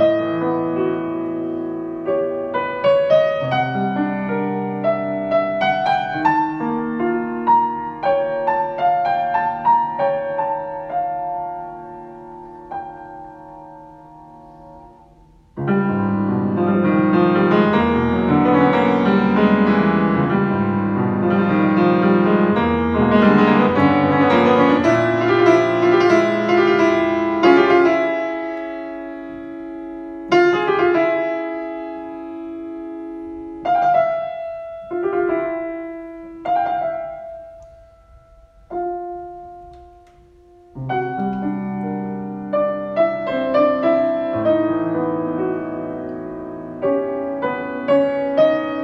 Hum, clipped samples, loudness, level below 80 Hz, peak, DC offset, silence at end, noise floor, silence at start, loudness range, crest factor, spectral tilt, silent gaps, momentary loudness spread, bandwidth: none; under 0.1%; -18 LUFS; -48 dBFS; 0 dBFS; under 0.1%; 0 s; -49 dBFS; 0 s; 13 LU; 18 dB; -8 dB/octave; none; 17 LU; 6.8 kHz